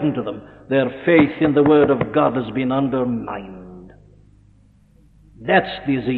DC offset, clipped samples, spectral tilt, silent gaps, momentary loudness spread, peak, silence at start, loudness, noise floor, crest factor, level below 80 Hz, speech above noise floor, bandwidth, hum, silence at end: under 0.1%; under 0.1%; -10 dB/octave; none; 17 LU; -2 dBFS; 0 s; -18 LUFS; -52 dBFS; 18 dB; -50 dBFS; 34 dB; 4.5 kHz; none; 0 s